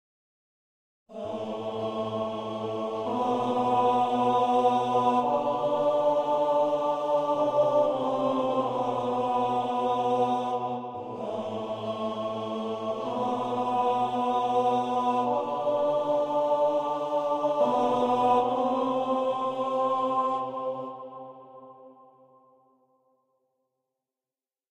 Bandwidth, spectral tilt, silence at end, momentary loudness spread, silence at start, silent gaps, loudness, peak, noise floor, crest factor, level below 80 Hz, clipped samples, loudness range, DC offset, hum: 9.8 kHz; -6.5 dB/octave; 2.8 s; 9 LU; 1.1 s; none; -27 LUFS; -12 dBFS; under -90 dBFS; 16 dB; -72 dBFS; under 0.1%; 7 LU; under 0.1%; none